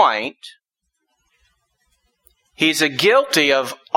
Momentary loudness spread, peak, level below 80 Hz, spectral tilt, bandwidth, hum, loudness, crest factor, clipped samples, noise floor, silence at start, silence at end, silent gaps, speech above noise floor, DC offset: 8 LU; -2 dBFS; -64 dBFS; -2.5 dB/octave; 16.5 kHz; none; -17 LUFS; 18 dB; under 0.1%; -75 dBFS; 0 s; 0.2 s; none; 57 dB; under 0.1%